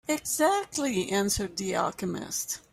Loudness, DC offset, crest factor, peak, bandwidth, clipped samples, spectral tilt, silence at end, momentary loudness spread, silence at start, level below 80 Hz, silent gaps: -28 LUFS; under 0.1%; 18 dB; -12 dBFS; 16 kHz; under 0.1%; -3 dB/octave; 0.15 s; 7 LU; 0.1 s; -54 dBFS; none